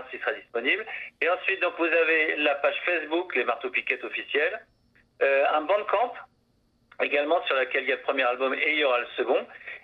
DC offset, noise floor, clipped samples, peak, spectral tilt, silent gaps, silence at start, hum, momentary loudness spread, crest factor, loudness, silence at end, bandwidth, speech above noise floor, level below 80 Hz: under 0.1%; -67 dBFS; under 0.1%; -8 dBFS; -4.5 dB/octave; none; 0 s; none; 7 LU; 20 dB; -25 LUFS; 0.05 s; 5.6 kHz; 41 dB; -74 dBFS